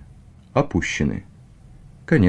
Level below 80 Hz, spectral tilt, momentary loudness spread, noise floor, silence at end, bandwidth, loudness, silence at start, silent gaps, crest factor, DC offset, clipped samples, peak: -40 dBFS; -6.5 dB/octave; 12 LU; -46 dBFS; 0 s; 9.8 kHz; -23 LUFS; 0.55 s; none; 18 dB; under 0.1%; under 0.1%; -4 dBFS